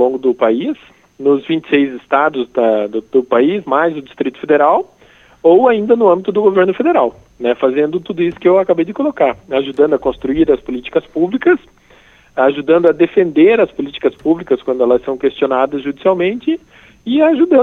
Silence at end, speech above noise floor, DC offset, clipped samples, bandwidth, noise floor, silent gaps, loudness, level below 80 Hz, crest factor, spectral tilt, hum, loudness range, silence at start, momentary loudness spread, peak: 0 s; 33 dB; under 0.1%; under 0.1%; 6.6 kHz; -46 dBFS; none; -14 LUFS; -50 dBFS; 14 dB; -8 dB/octave; none; 3 LU; 0 s; 8 LU; 0 dBFS